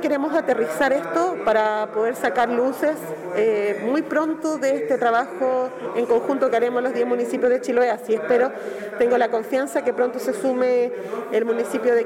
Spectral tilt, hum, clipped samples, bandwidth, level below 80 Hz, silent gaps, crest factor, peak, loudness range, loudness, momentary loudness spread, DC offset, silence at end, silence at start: -4.5 dB/octave; none; under 0.1%; 16 kHz; -64 dBFS; none; 12 dB; -10 dBFS; 1 LU; -22 LUFS; 4 LU; under 0.1%; 0 s; 0 s